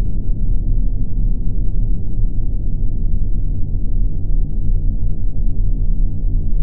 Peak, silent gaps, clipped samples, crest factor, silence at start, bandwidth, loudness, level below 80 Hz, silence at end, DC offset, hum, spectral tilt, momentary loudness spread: -4 dBFS; none; under 0.1%; 8 dB; 0 s; 0.8 kHz; -23 LUFS; -16 dBFS; 0 s; under 0.1%; none; -15.5 dB/octave; 2 LU